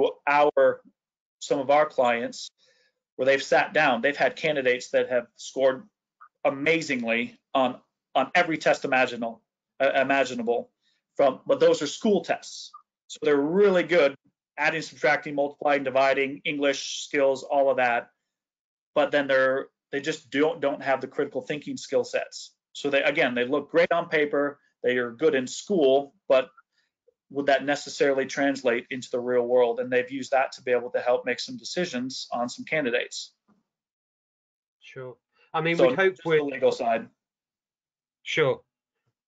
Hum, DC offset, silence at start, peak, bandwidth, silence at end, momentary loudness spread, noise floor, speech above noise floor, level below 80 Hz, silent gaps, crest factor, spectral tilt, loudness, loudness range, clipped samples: none; under 0.1%; 0 s; -8 dBFS; 8 kHz; 0.7 s; 11 LU; under -90 dBFS; over 66 dB; -76 dBFS; 1.20-1.39 s, 3.12-3.17 s, 13.04-13.09 s, 18.59-18.94 s, 33.92-34.80 s; 18 dB; -4 dB/octave; -25 LUFS; 4 LU; under 0.1%